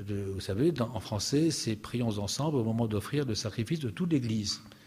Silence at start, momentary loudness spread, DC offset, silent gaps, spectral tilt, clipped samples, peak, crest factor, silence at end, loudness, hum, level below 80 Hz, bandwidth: 0 s; 6 LU; under 0.1%; none; -5.5 dB/octave; under 0.1%; -16 dBFS; 14 dB; 0.1 s; -31 LUFS; none; -58 dBFS; 15.5 kHz